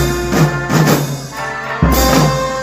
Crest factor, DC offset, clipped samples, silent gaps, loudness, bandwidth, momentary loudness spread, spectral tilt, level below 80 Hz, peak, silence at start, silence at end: 14 dB; under 0.1%; under 0.1%; none; -14 LUFS; 16.5 kHz; 10 LU; -5 dB/octave; -24 dBFS; 0 dBFS; 0 s; 0 s